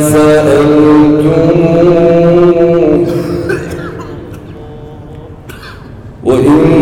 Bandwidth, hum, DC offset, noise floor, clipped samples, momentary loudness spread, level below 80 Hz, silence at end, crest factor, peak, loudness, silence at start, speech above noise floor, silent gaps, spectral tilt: 16 kHz; none; under 0.1%; -28 dBFS; under 0.1%; 22 LU; -32 dBFS; 0 s; 8 dB; 0 dBFS; -8 LUFS; 0 s; 23 dB; none; -7 dB/octave